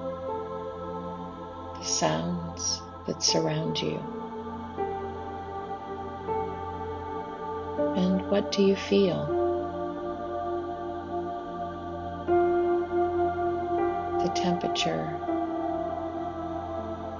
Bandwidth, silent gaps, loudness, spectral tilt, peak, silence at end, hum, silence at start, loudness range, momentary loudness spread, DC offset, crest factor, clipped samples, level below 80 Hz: 7.6 kHz; none; -29 LUFS; -4.5 dB/octave; -10 dBFS; 0 s; none; 0 s; 6 LU; 12 LU; under 0.1%; 20 dB; under 0.1%; -50 dBFS